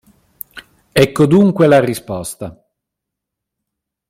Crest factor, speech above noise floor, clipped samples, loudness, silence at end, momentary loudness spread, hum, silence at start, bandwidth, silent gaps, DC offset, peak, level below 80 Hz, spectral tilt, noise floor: 16 dB; 68 dB; under 0.1%; -13 LUFS; 1.6 s; 22 LU; none; 0.55 s; 16.5 kHz; none; under 0.1%; 0 dBFS; -48 dBFS; -6.5 dB/octave; -80 dBFS